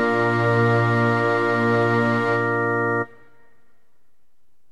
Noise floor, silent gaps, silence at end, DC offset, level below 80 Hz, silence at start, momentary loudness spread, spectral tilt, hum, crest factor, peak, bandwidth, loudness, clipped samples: -68 dBFS; none; 1.65 s; 0.6%; -62 dBFS; 0 s; 4 LU; -7.5 dB/octave; none; 14 dB; -8 dBFS; 9.8 kHz; -20 LUFS; under 0.1%